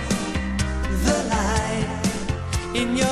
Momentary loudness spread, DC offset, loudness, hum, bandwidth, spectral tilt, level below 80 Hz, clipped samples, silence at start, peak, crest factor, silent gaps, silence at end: 5 LU; under 0.1%; -24 LUFS; none; 14.5 kHz; -4.5 dB/octave; -30 dBFS; under 0.1%; 0 s; -6 dBFS; 16 dB; none; 0 s